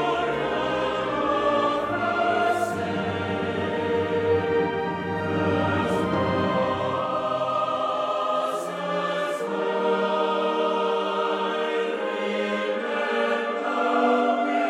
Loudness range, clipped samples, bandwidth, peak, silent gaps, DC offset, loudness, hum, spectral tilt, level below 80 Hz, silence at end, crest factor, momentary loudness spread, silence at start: 1 LU; under 0.1%; 13.5 kHz; -10 dBFS; none; under 0.1%; -24 LUFS; none; -6 dB/octave; -58 dBFS; 0 s; 14 dB; 4 LU; 0 s